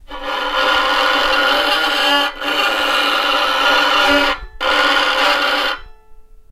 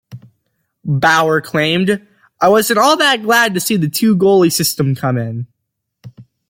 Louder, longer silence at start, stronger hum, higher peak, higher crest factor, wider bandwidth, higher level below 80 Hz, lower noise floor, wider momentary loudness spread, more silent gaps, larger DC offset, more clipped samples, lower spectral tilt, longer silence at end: about the same, -14 LUFS vs -13 LUFS; about the same, 0.1 s vs 0.1 s; neither; about the same, 0 dBFS vs 0 dBFS; about the same, 16 dB vs 14 dB; about the same, 16 kHz vs 17 kHz; first, -38 dBFS vs -56 dBFS; second, -39 dBFS vs -74 dBFS; second, 6 LU vs 10 LU; neither; neither; neither; second, -1 dB/octave vs -4.5 dB/octave; about the same, 0.3 s vs 0.25 s